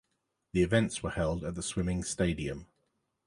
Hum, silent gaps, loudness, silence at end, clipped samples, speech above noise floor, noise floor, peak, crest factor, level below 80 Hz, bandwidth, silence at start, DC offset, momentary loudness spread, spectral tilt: none; none; -32 LUFS; 0.6 s; under 0.1%; 50 dB; -81 dBFS; -12 dBFS; 22 dB; -46 dBFS; 11.5 kHz; 0.55 s; under 0.1%; 9 LU; -5.5 dB/octave